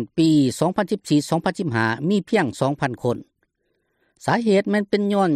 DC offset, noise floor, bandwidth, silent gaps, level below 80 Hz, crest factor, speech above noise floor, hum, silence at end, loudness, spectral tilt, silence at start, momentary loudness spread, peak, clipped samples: under 0.1%; -71 dBFS; 14 kHz; none; -60 dBFS; 14 dB; 51 dB; none; 0 s; -21 LUFS; -6 dB/octave; 0 s; 6 LU; -8 dBFS; under 0.1%